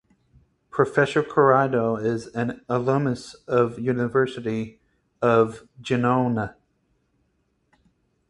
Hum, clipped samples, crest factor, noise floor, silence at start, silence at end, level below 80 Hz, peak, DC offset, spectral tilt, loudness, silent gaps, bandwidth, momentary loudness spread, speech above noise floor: none; under 0.1%; 20 dB; -70 dBFS; 0.75 s; 1.8 s; -58 dBFS; -4 dBFS; under 0.1%; -7 dB/octave; -23 LUFS; none; 11 kHz; 10 LU; 48 dB